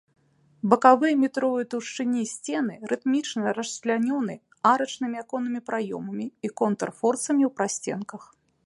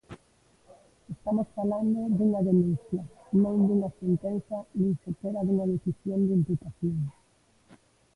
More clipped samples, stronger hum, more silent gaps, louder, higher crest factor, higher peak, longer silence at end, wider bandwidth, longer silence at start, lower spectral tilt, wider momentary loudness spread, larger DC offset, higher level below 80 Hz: neither; neither; neither; first, -25 LUFS vs -28 LUFS; first, 24 dB vs 16 dB; first, -2 dBFS vs -14 dBFS; second, 0.4 s vs 1.05 s; about the same, 11.5 kHz vs 10.5 kHz; first, 0.65 s vs 0.1 s; second, -4.5 dB/octave vs -11 dB/octave; about the same, 12 LU vs 10 LU; neither; second, -76 dBFS vs -60 dBFS